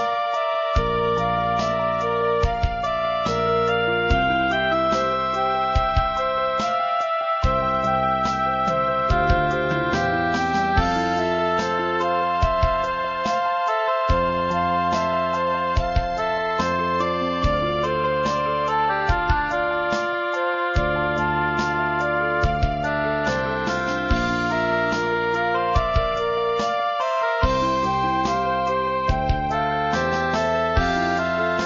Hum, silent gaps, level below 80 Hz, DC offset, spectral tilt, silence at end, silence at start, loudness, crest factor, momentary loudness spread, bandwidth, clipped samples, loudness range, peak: none; none; -32 dBFS; under 0.1%; -6 dB/octave; 0 s; 0 s; -22 LUFS; 16 dB; 2 LU; 7.6 kHz; under 0.1%; 1 LU; -6 dBFS